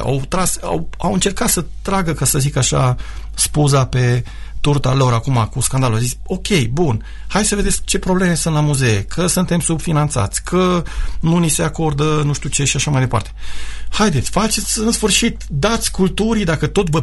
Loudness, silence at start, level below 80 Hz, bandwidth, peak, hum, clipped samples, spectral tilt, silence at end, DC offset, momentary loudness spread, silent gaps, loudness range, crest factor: -17 LUFS; 0 s; -28 dBFS; 12 kHz; 0 dBFS; none; under 0.1%; -4.5 dB/octave; 0 s; under 0.1%; 6 LU; none; 1 LU; 16 dB